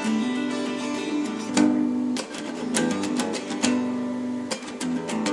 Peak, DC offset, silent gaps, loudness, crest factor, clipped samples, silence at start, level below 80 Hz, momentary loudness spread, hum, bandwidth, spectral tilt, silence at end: -6 dBFS; under 0.1%; none; -26 LUFS; 18 dB; under 0.1%; 0 s; -70 dBFS; 8 LU; none; 11.5 kHz; -4 dB/octave; 0 s